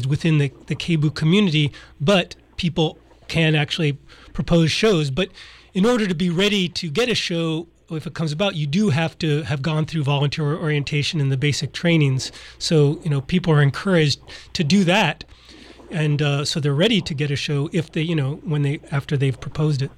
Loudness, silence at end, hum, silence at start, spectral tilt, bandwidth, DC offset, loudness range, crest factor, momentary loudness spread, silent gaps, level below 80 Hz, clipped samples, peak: -21 LUFS; 0.05 s; none; 0 s; -6 dB/octave; 12 kHz; under 0.1%; 2 LU; 16 dB; 8 LU; none; -46 dBFS; under 0.1%; -6 dBFS